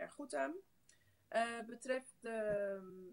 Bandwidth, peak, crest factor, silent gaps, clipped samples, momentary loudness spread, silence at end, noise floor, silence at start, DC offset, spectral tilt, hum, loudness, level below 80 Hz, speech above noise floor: 16 kHz; -26 dBFS; 18 dB; none; under 0.1%; 8 LU; 0 s; -73 dBFS; 0 s; under 0.1%; -4 dB/octave; none; -42 LUFS; -76 dBFS; 31 dB